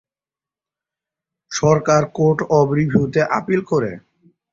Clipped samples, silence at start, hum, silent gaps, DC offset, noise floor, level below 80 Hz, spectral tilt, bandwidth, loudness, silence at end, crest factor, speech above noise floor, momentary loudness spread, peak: under 0.1%; 1.5 s; none; none; under 0.1%; under -90 dBFS; -52 dBFS; -6.5 dB/octave; 7.6 kHz; -18 LUFS; 0.55 s; 18 dB; over 73 dB; 6 LU; -2 dBFS